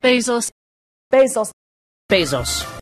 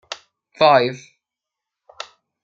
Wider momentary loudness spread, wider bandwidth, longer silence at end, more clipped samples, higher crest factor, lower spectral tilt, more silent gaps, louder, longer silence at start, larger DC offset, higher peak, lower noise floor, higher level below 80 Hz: second, 9 LU vs 23 LU; first, 13.5 kHz vs 7.6 kHz; second, 0 s vs 1.45 s; neither; about the same, 16 dB vs 20 dB; second, -3 dB/octave vs -4.5 dB/octave; first, 0.52-1.11 s, 1.53-2.09 s vs none; about the same, -18 LUFS vs -16 LUFS; about the same, 0.05 s vs 0.1 s; neither; about the same, -4 dBFS vs -2 dBFS; first, under -90 dBFS vs -85 dBFS; first, -42 dBFS vs -68 dBFS